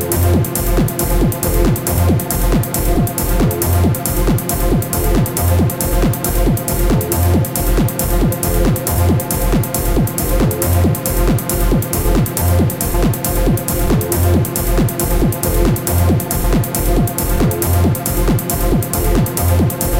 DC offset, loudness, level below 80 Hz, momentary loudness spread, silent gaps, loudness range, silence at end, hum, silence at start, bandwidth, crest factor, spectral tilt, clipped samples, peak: under 0.1%; -15 LUFS; -20 dBFS; 2 LU; none; 0 LU; 0 s; none; 0 s; 17.5 kHz; 14 dB; -5.5 dB/octave; under 0.1%; 0 dBFS